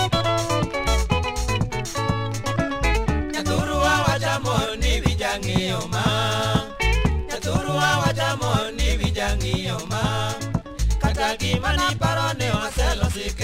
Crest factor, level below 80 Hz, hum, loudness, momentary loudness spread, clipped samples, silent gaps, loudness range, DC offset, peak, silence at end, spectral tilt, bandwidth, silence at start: 18 dB; -28 dBFS; none; -23 LUFS; 5 LU; under 0.1%; none; 2 LU; under 0.1%; -4 dBFS; 0 s; -4.5 dB/octave; 16 kHz; 0 s